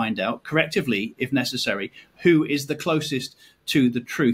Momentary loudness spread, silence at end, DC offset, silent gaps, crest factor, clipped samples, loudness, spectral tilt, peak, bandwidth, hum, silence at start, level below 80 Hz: 10 LU; 0 s; under 0.1%; none; 20 dB; under 0.1%; -23 LUFS; -5 dB/octave; -4 dBFS; 16 kHz; none; 0 s; -62 dBFS